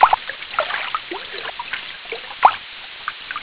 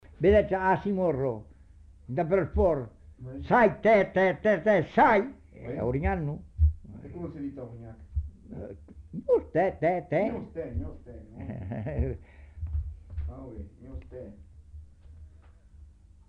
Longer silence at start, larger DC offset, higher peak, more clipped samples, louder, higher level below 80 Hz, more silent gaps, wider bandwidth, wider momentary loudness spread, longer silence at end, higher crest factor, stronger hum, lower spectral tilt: second, 0 s vs 0.2 s; neither; first, 0 dBFS vs -10 dBFS; neither; first, -23 LUFS vs -27 LUFS; second, -56 dBFS vs -40 dBFS; neither; second, 4 kHz vs 6.4 kHz; second, 13 LU vs 22 LU; second, 0 s vs 0.45 s; about the same, 22 dB vs 18 dB; neither; second, 2 dB/octave vs -9 dB/octave